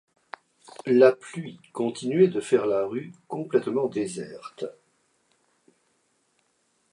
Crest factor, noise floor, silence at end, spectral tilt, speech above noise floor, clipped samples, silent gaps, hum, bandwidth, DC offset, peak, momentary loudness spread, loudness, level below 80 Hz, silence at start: 22 dB; -70 dBFS; 2.2 s; -6.5 dB/octave; 46 dB; under 0.1%; none; none; 11 kHz; under 0.1%; -4 dBFS; 20 LU; -25 LUFS; -76 dBFS; 0.85 s